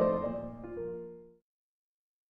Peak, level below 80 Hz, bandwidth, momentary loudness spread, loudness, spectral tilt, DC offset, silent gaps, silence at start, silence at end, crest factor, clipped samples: -16 dBFS; -58 dBFS; 5.2 kHz; 16 LU; -37 LUFS; -10.5 dB/octave; under 0.1%; none; 0 s; 0.95 s; 20 dB; under 0.1%